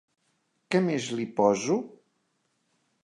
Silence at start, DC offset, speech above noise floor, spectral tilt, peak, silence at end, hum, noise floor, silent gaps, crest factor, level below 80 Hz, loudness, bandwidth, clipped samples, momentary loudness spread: 0.7 s; under 0.1%; 49 dB; -5.5 dB/octave; -10 dBFS; 1.15 s; none; -74 dBFS; none; 20 dB; -76 dBFS; -27 LUFS; 11 kHz; under 0.1%; 7 LU